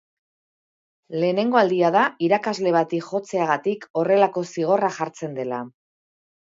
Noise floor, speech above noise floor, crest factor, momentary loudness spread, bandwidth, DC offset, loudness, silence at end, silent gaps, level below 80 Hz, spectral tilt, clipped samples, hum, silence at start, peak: under -90 dBFS; over 69 dB; 18 dB; 11 LU; 7.8 kHz; under 0.1%; -22 LUFS; 0.8 s; 3.90-3.94 s; -74 dBFS; -6 dB/octave; under 0.1%; none; 1.1 s; -4 dBFS